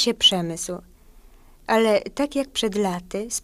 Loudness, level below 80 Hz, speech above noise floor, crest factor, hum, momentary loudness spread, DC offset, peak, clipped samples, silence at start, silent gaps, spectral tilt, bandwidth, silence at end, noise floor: -22 LUFS; -50 dBFS; 27 dB; 18 dB; none; 14 LU; under 0.1%; -6 dBFS; under 0.1%; 0 s; none; -3 dB/octave; 15.5 kHz; 0.05 s; -49 dBFS